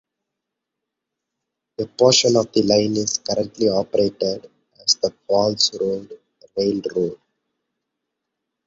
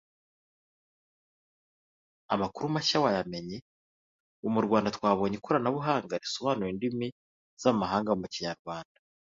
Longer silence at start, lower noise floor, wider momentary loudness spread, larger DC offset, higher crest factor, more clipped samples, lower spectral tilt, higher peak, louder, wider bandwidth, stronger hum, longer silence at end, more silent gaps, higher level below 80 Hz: second, 1.8 s vs 2.3 s; second, -82 dBFS vs under -90 dBFS; about the same, 14 LU vs 12 LU; neither; about the same, 20 dB vs 22 dB; neither; second, -3.5 dB/octave vs -5.5 dB/octave; first, -2 dBFS vs -10 dBFS; first, -19 LUFS vs -30 LUFS; about the same, 8 kHz vs 7.8 kHz; neither; first, 1.5 s vs 0.55 s; second, none vs 3.62-4.43 s, 7.12-7.57 s, 8.59-8.65 s; first, -58 dBFS vs -64 dBFS